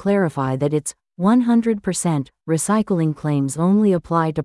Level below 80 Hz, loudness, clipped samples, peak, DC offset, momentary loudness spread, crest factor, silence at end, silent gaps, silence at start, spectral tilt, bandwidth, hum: -54 dBFS; -19 LUFS; under 0.1%; -6 dBFS; under 0.1%; 6 LU; 14 dB; 0 s; none; 0 s; -6.5 dB/octave; 12 kHz; none